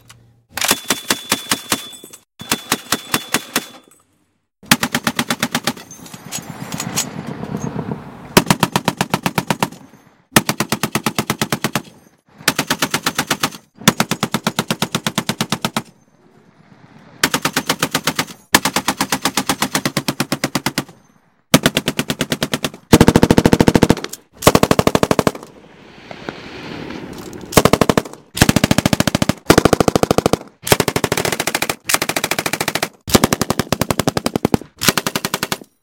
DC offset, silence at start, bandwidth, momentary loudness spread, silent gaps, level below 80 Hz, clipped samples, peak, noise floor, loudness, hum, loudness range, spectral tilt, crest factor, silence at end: under 0.1%; 0.55 s; over 20 kHz; 14 LU; none; -38 dBFS; 0.3%; 0 dBFS; -64 dBFS; -17 LUFS; none; 6 LU; -3.5 dB/octave; 18 dB; 0.25 s